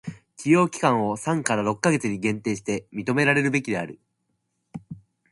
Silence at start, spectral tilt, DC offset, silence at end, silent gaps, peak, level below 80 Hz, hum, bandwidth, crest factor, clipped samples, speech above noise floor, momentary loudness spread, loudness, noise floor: 0.05 s; -5.5 dB/octave; under 0.1%; 0.35 s; none; -2 dBFS; -62 dBFS; none; 11.5 kHz; 24 dB; under 0.1%; 52 dB; 20 LU; -23 LUFS; -75 dBFS